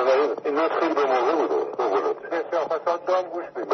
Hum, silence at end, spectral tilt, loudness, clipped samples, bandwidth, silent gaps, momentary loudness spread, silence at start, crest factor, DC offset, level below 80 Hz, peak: none; 0 s; -4.5 dB/octave; -24 LUFS; under 0.1%; 6.4 kHz; none; 5 LU; 0 s; 14 dB; under 0.1%; -82 dBFS; -8 dBFS